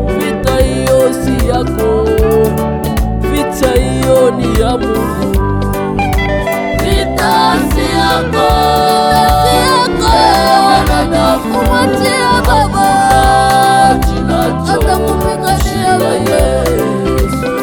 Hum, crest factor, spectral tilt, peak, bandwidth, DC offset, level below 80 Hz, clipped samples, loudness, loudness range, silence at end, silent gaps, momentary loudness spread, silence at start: none; 10 dB; -5 dB/octave; 0 dBFS; over 20 kHz; under 0.1%; -20 dBFS; under 0.1%; -11 LUFS; 3 LU; 0 s; none; 6 LU; 0 s